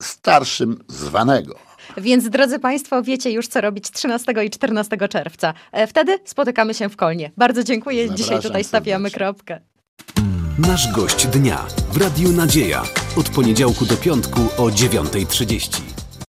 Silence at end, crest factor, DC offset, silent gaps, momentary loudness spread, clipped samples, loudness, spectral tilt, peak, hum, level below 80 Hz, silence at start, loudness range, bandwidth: 0.15 s; 18 dB; under 0.1%; 9.88-9.97 s; 8 LU; under 0.1%; -18 LUFS; -4.5 dB/octave; -2 dBFS; none; -36 dBFS; 0 s; 4 LU; 16 kHz